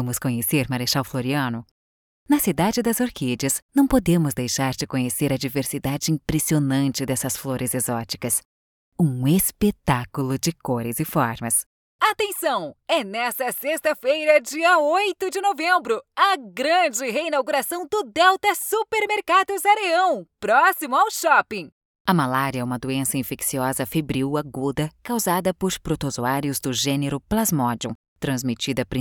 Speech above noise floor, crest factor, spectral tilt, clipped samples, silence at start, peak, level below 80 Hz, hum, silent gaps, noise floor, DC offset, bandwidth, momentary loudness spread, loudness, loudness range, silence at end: over 68 dB; 18 dB; -4 dB/octave; under 0.1%; 0 s; -4 dBFS; -48 dBFS; none; 1.71-2.26 s, 3.62-3.69 s, 8.45-8.92 s, 11.66-11.99 s, 21.72-22.05 s, 27.95-28.16 s; under -90 dBFS; under 0.1%; over 20 kHz; 7 LU; -22 LUFS; 4 LU; 0 s